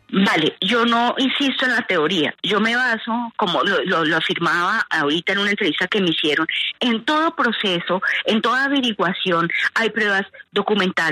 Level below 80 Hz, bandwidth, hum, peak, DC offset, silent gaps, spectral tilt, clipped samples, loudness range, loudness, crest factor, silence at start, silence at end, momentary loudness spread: -66 dBFS; 13.5 kHz; none; -6 dBFS; under 0.1%; none; -4.5 dB/octave; under 0.1%; 1 LU; -19 LUFS; 14 dB; 0.1 s; 0 s; 3 LU